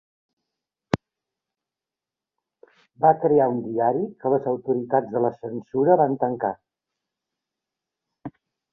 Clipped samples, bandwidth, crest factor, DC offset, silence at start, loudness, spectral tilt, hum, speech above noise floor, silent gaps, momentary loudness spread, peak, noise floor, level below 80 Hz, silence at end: under 0.1%; 7.2 kHz; 24 dB; under 0.1%; 0.95 s; -23 LUFS; -9 dB/octave; none; 67 dB; none; 18 LU; -2 dBFS; -89 dBFS; -62 dBFS; 0.45 s